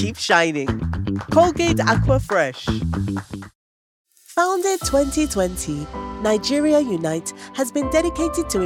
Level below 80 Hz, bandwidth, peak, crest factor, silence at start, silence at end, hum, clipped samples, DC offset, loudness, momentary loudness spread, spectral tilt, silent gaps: -36 dBFS; 17 kHz; 0 dBFS; 20 dB; 0 s; 0 s; none; under 0.1%; under 0.1%; -20 LUFS; 10 LU; -5 dB/octave; 3.55-4.05 s